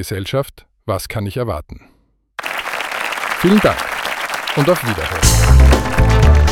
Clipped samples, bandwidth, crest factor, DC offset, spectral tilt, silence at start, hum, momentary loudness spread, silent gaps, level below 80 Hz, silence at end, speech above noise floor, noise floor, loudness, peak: under 0.1%; 17 kHz; 14 dB; under 0.1%; -5 dB/octave; 0 s; none; 13 LU; none; -18 dBFS; 0 s; 21 dB; -35 dBFS; -16 LUFS; 0 dBFS